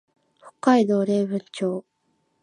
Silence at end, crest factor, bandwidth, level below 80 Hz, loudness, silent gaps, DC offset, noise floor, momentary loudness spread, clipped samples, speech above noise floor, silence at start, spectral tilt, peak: 0.6 s; 20 dB; 10.5 kHz; -74 dBFS; -22 LUFS; none; under 0.1%; -70 dBFS; 9 LU; under 0.1%; 49 dB; 0.45 s; -6.5 dB/octave; -4 dBFS